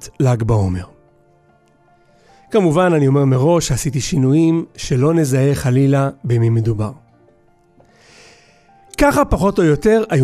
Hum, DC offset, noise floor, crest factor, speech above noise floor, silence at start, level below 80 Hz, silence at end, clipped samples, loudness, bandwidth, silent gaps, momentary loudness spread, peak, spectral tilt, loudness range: none; under 0.1%; -54 dBFS; 14 dB; 39 dB; 0 s; -34 dBFS; 0 s; under 0.1%; -16 LUFS; 14.5 kHz; none; 7 LU; -2 dBFS; -6.5 dB/octave; 5 LU